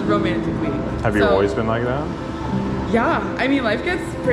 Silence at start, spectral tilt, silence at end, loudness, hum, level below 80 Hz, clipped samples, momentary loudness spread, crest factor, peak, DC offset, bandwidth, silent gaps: 0 s; -7 dB/octave; 0 s; -20 LUFS; none; -36 dBFS; under 0.1%; 7 LU; 16 dB; -4 dBFS; under 0.1%; 12.5 kHz; none